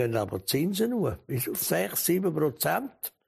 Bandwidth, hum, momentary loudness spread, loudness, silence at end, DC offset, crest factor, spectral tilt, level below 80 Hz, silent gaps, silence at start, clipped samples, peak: 15.5 kHz; none; 5 LU; -28 LUFS; 0.2 s; under 0.1%; 16 dB; -4.5 dB/octave; -58 dBFS; none; 0 s; under 0.1%; -12 dBFS